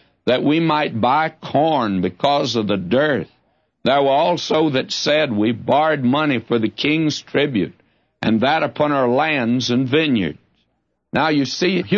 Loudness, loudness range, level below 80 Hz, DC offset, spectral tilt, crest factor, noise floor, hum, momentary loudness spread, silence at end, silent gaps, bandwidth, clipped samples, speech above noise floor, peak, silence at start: -18 LUFS; 1 LU; -58 dBFS; under 0.1%; -5.5 dB/octave; 14 dB; -70 dBFS; none; 4 LU; 0 s; none; 7.6 kHz; under 0.1%; 52 dB; -4 dBFS; 0.25 s